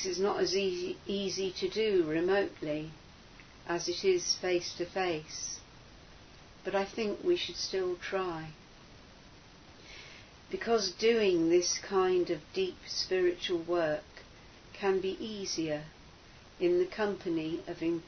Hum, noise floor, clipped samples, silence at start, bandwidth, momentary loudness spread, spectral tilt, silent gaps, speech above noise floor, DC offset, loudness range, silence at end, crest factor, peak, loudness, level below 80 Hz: none; -55 dBFS; under 0.1%; 0 s; 6.6 kHz; 15 LU; -3.5 dB/octave; none; 23 dB; under 0.1%; 6 LU; 0 s; 16 dB; -16 dBFS; -32 LUFS; -60 dBFS